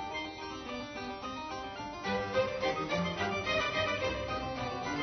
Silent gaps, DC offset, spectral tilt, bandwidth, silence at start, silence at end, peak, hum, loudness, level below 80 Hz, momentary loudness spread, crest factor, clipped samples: none; under 0.1%; -2.5 dB/octave; 6.4 kHz; 0 s; 0 s; -20 dBFS; none; -35 LUFS; -54 dBFS; 9 LU; 16 dB; under 0.1%